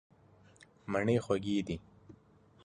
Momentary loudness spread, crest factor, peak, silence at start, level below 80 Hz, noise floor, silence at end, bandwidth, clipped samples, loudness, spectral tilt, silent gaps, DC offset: 12 LU; 20 dB; -16 dBFS; 0.85 s; -60 dBFS; -63 dBFS; 0.55 s; 11 kHz; under 0.1%; -34 LUFS; -6.5 dB/octave; none; under 0.1%